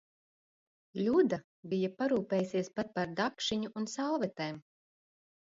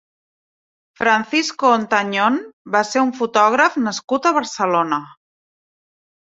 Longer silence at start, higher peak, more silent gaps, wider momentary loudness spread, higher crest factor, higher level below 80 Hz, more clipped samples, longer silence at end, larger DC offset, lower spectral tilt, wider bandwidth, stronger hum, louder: about the same, 0.95 s vs 1 s; second, -16 dBFS vs -2 dBFS; about the same, 1.44-1.63 s vs 2.53-2.65 s, 4.04-4.08 s; first, 11 LU vs 6 LU; about the same, 18 dB vs 18 dB; second, -72 dBFS vs -66 dBFS; neither; second, 0.95 s vs 1.25 s; neither; first, -5.5 dB/octave vs -3.5 dB/octave; about the same, 7.8 kHz vs 8.2 kHz; neither; second, -34 LUFS vs -18 LUFS